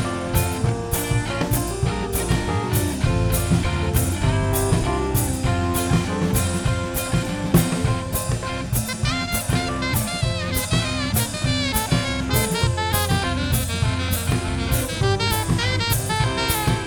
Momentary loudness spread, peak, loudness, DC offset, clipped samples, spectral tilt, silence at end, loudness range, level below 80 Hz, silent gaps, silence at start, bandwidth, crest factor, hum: 3 LU; -2 dBFS; -22 LUFS; under 0.1%; under 0.1%; -4.5 dB/octave; 0 s; 1 LU; -32 dBFS; none; 0 s; over 20 kHz; 18 dB; none